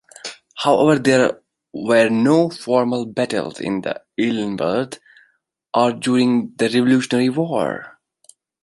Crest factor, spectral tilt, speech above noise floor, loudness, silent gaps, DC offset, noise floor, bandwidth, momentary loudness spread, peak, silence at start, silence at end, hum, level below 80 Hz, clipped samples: 18 dB; -5.5 dB/octave; 44 dB; -18 LUFS; none; under 0.1%; -62 dBFS; 11.5 kHz; 15 LU; -2 dBFS; 0.25 s; 0.75 s; none; -62 dBFS; under 0.1%